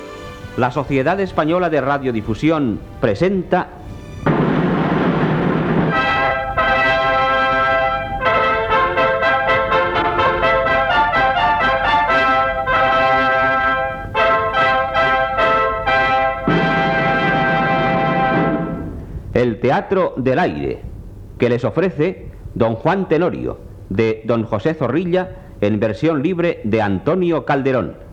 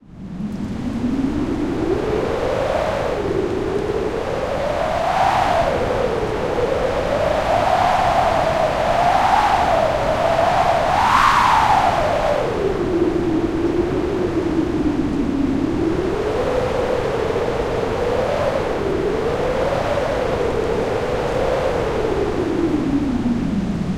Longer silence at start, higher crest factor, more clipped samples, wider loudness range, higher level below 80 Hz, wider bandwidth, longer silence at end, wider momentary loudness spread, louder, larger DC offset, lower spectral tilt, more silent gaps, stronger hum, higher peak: about the same, 0 s vs 0.1 s; about the same, 16 dB vs 16 dB; neither; about the same, 4 LU vs 5 LU; about the same, -38 dBFS vs -34 dBFS; second, 9.6 kHz vs 16.5 kHz; about the same, 0 s vs 0 s; about the same, 7 LU vs 6 LU; about the same, -17 LUFS vs -19 LUFS; neither; about the same, -7 dB/octave vs -6 dB/octave; neither; neither; about the same, 0 dBFS vs -2 dBFS